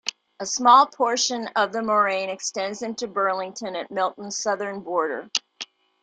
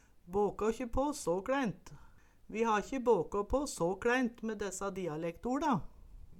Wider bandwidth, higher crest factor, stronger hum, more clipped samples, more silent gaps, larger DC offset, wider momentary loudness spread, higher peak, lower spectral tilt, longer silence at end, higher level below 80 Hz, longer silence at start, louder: second, 10 kHz vs 16.5 kHz; about the same, 20 dB vs 18 dB; neither; neither; neither; neither; first, 15 LU vs 8 LU; first, -4 dBFS vs -18 dBFS; second, -1.5 dB/octave vs -5 dB/octave; first, 0.4 s vs 0 s; second, -74 dBFS vs -52 dBFS; second, 0.05 s vs 0.25 s; first, -23 LUFS vs -35 LUFS